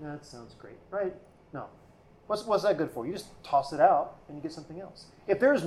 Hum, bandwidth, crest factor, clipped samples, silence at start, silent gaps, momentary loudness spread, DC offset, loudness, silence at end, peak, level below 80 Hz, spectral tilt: none; 13 kHz; 20 dB; under 0.1%; 0 s; none; 23 LU; under 0.1%; -29 LUFS; 0 s; -10 dBFS; -64 dBFS; -5.5 dB/octave